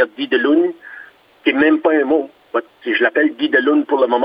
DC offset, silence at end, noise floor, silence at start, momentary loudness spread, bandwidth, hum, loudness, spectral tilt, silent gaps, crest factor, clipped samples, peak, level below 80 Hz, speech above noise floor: under 0.1%; 0 s; -41 dBFS; 0 s; 10 LU; 5.2 kHz; none; -16 LUFS; -6.5 dB/octave; none; 16 dB; under 0.1%; 0 dBFS; -64 dBFS; 25 dB